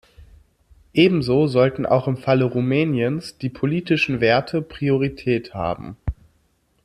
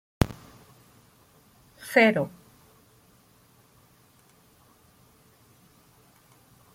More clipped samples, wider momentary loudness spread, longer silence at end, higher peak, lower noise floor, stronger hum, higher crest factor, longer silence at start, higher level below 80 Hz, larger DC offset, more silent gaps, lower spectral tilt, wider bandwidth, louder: neither; second, 10 LU vs 24 LU; second, 0.7 s vs 4.45 s; about the same, -2 dBFS vs -2 dBFS; first, -64 dBFS vs -60 dBFS; neither; second, 18 dB vs 30 dB; about the same, 0.2 s vs 0.2 s; first, -44 dBFS vs -50 dBFS; neither; neither; first, -7.5 dB/octave vs -6 dB/octave; second, 11.5 kHz vs 16.5 kHz; first, -20 LUFS vs -24 LUFS